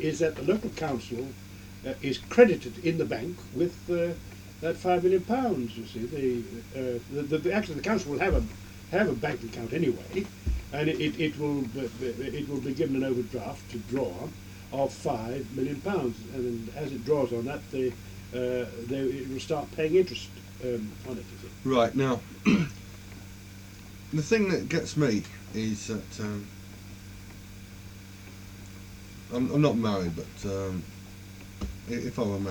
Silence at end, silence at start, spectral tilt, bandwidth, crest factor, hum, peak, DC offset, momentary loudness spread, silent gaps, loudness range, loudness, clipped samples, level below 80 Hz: 0 s; 0 s; -6 dB/octave; 19 kHz; 24 dB; none; -6 dBFS; under 0.1%; 20 LU; none; 5 LU; -30 LUFS; under 0.1%; -46 dBFS